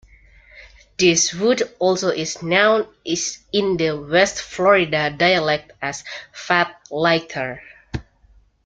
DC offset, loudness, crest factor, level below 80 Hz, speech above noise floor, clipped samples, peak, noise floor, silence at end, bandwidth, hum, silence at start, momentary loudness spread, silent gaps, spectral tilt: under 0.1%; -19 LUFS; 20 dB; -50 dBFS; 35 dB; under 0.1%; -2 dBFS; -54 dBFS; 0.65 s; 9.4 kHz; none; 0.55 s; 17 LU; none; -3 dB/octave